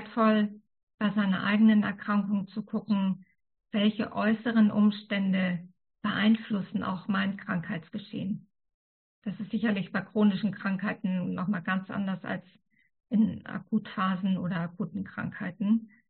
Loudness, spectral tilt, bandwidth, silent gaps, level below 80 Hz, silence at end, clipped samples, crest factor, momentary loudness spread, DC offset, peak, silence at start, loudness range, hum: -29 LUFS; -5.5 dB/octave; 4.4 kHz; 0.83-0.87 s, 0.94-0.98 s, 8.74-9.22 s; -70 dBFS; 0.2 s; under 0.1%; 16 dB; 12 LU; under 0.1%; -14 dBFS; 0 s; 4 LU; none